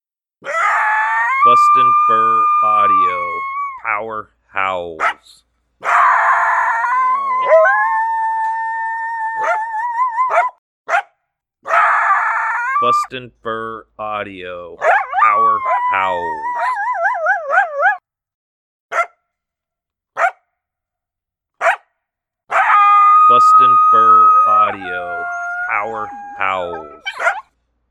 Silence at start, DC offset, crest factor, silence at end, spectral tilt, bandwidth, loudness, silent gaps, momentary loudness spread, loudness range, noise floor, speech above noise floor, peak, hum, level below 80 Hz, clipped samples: 0.45 s; under 0.1%; 14 dB; 0.5 s; -3 dB/octave; 10.5 kHz; -14 LUFS; 10.58-10.85 s, 18.34-18.89 s; 16 LU; 10 LU; -84 dBFS; 70 dB; 0 dBFS; none; -60 dBFS; under 0.1%